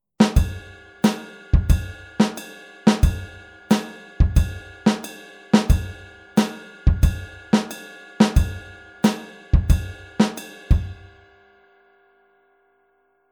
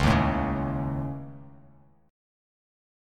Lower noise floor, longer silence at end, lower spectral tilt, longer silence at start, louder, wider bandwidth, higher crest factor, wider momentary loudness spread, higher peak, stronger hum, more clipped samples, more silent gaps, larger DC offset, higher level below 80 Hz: first, -64 dBFS vs -57 dBFS; first, 2.4 s vs 1 s; about the same, -6.5 dB/octave vs -7 dB/octave; first, 0.2 s vs 0 s; first, -22 LUFS vs -28 LUFS; first, 18 kHz vs 12.5 kHz; about the same, 20 dB vs 20 dB; about the same, 19 LU vs 20 LU; first, -2 dBFS vs -10 dBFS; neither; neither; neither; neither; first, -26 dBFS vs -38 dBFS